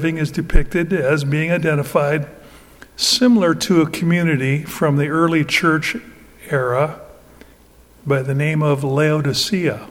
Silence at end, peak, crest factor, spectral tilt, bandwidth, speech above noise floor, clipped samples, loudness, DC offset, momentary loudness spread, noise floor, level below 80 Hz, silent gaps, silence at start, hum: 0.05 s; -2 dBFS; 16 dB; -5.5 dB/octave; 17 kHz; 31 dB; under 0.1%; -17 LUFS; under 0.1%; 8 LU; -48 dBFS; -30 dBFS; none; 0 s; none